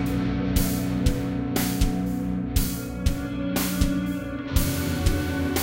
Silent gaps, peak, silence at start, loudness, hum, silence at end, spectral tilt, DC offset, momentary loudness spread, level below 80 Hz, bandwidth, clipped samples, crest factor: none; -6 dBFS; 0 s; -26 LUFS; none; 0 s; -5.5 dB/octave; under 0.1%; 4 LU; -30 dBFS; 17 kHz; under 0.1%; 18 dB